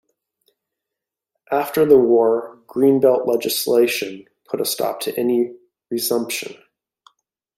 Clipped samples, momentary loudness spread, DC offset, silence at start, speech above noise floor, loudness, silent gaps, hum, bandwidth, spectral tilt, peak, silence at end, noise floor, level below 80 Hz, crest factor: under 0.1%; 14 LU; under 0.1%; 1.5 s; 67 dB; -19 LUFS; none; none; 16.5 kHz; -4 dB/octave; -2 dBFS; 1.05 s; -85 dBFS; -62 dBFS; 18 dB